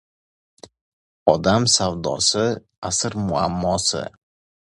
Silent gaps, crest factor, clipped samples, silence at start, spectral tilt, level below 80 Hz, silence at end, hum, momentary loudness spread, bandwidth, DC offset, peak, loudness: 2.78-2.82 s; 22 dB; under 0.1%; 1.25 s; -3.5 dB/octave; -46 dBFS; 0.6 s; none; 7 LU; 11.5 kHz; under 0.1%; 0 dBFS; -20 LUFS